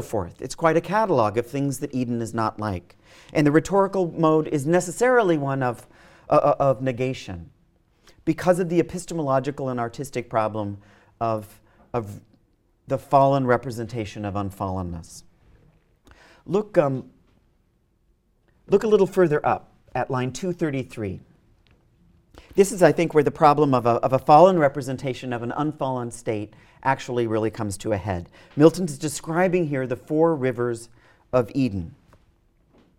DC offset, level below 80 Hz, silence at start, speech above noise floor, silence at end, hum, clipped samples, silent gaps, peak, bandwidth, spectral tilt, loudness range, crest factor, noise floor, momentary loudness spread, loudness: under 0.1%; -54 dBFS; 0 s; 43 dB; 1.1 s; none; under 0.1%; none; -2 dBFS; 16.5 kHz; -6.5 dB/octave; 9 LU; 22 dB; -65 dBFS; 13 LU; -23 LUFS